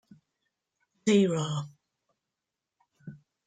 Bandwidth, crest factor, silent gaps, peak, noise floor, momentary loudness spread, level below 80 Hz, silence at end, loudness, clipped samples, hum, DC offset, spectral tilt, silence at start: 9.4 kHz; 22 dB; none; -12 dBFS; -88 dBFS; 25 LU; -72 dBFS; 0.3 s; -27 LUFS; under 0.1%; none; under 0.1%; -6 dB/octave; 1.05 s